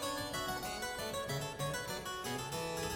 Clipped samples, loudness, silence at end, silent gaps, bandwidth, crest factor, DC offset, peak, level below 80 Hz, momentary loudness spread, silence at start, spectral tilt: under 0.1%; -39 LUFS; 0 s; none; 17 kHz; 14 dB; under 0.1%; -26 dBFS; -58 dBFS; 2 LU; 0 s; -3 dB/octave